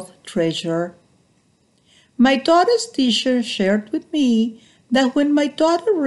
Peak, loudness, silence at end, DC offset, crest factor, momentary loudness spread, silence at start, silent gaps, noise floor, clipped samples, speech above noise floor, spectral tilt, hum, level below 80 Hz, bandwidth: -4 dBFS; -18 LUFS; 0 s; under 0.1%; 16 dB; 9 LU; 0 s; none; -60 dBFS; under 0.1%; 42 dB; -4.5 dB/octave; none; -62 dBFS; 12 kHz